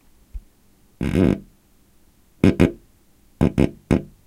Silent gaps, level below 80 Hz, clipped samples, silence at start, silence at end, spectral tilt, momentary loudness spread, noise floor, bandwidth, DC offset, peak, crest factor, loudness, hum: none; -36 dBFS; under 0.1%; 0.35 s; 0.2 s; -8 dB/octave; 11 LU; -55 dBFS; 15 kHz; under 0.1%; 0 dBFS; 22 dB; -21 LUFS; none